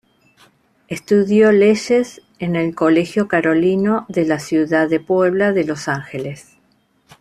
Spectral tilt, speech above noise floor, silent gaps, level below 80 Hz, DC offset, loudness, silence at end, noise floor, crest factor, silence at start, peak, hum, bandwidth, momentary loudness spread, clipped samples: -6.5 dB/octave; 44 dB; none; -58 dBFS; under 0.1%; -16 LUFS; 0.8 s; -60 dBFS; 14 dB; 0.9 s; -2 dBFS; none; 13 kHz; 15 LU; under 0.1%